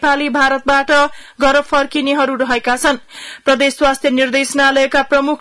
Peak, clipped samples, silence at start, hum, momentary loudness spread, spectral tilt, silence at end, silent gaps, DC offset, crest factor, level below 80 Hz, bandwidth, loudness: -2 dBFS; under 0.1%; 0 s; none; 5 LU; -2 dB/octave; 0.05 s; none; under 0.1%; 12 dB; -40 dBFS; 12 kHz; -14 LUFS